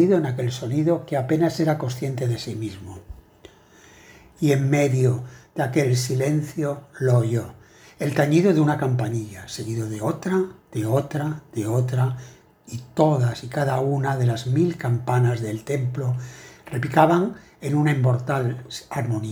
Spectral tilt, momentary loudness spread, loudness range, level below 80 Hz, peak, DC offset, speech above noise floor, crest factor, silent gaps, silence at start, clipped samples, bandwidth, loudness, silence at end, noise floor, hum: -7 dB/octave; 12 LU; 4 LU; -56 dBFS; -2 dBFS; under 0.1%; 29 dB; 22 dB; none; 0 s; under 0.1%; 19.5 kHz; -23 LUFS; 0 s; -51 dBFS; none